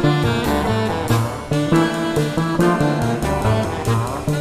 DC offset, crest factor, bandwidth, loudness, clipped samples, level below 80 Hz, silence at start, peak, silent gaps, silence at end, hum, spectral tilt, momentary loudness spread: under 0.1%; 16 dB; 15.5 kHz; -19 LUFS; under 0.1%; -34 dBFS; 0 s; -2 dBFS; none; 0 s; none; -6.5 dB/octave; 4 LU